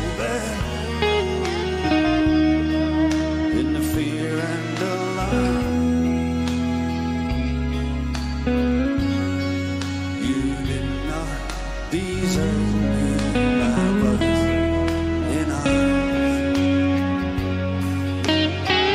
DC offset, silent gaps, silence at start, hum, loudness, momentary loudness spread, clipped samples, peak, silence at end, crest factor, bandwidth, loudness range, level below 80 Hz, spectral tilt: under 0.1%; none; 0 s; none; -22 LUFS; 6 LU; under 0.1%; -6 dBFS; 0 s; 16 dB; 15.5 kHz; 3 LU; -32 dBFS; -6 dB/octave